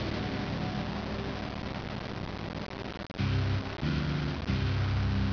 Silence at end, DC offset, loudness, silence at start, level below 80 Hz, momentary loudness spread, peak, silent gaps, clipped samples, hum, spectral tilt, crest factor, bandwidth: 0 s; under 0.1%; -33 LUFS; 0 s; -42 dBFS; 8 LU; -18 dBFS; none; under 0.1%; none; -7 dB/octave; 14 dB; 5.4 kHz